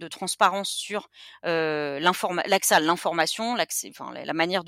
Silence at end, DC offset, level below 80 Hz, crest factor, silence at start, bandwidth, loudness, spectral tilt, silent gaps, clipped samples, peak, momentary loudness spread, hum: 0 s; under 0.1%; -72 dBFS; 20 dB; 0 s; 16.5 kHz; -24 LUFS; -2.5 dB/octave; none; under 0.1%; -6 dBFS; 12 LU; none